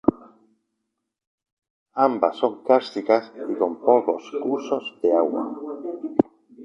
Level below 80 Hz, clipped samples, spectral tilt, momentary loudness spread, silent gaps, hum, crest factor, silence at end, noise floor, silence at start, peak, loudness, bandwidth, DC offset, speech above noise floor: -62 dBFS; under 0.1%; -6.5 dB/octave; 12 LU; 1.27-1.38 s, 1.52-1.57 s, 1.70-1.86 s; none; 22 dB; 0 s; -80 dBFS; 0.05 s; -2 dBFS; -23 LUFS; 7.4 kHz; under 0.1%; 58 dB